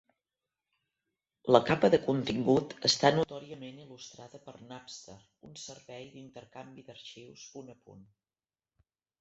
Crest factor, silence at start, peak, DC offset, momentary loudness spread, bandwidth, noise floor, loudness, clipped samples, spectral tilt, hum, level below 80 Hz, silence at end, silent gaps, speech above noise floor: 28 dB; 1.45 s; -6 dBFS; under 0.1%; 24 LU; 8.2 kHz; under -90 dBFS; -27 LUFS; under 0.1%; -4.5 dB/octave; none; -66 dBFS; 1.45 s; none; over 58 dB